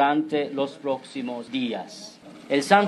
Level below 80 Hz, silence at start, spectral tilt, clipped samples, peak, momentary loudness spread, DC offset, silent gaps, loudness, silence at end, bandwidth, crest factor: -78 dBFS; 0 s; -4.5 dB/octave; under 0.1%; -2 dBFS; 18 LU; under 0.1%; none; -27 LUFS; 0 s; 12.5 kHz; 22 dB